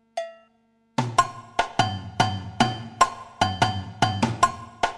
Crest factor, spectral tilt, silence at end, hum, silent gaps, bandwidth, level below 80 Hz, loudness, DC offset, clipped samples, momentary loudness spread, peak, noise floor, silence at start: 22 dB; -4 dB/octave; 0 s; 50 Hz at -45 dBFS; none; 13.5 kHz; -50 dBFS; -25 LUFS; under 0.1%; under 0.1%; 7 LU; -4 dBFS; -64 dBFS; 0.15 s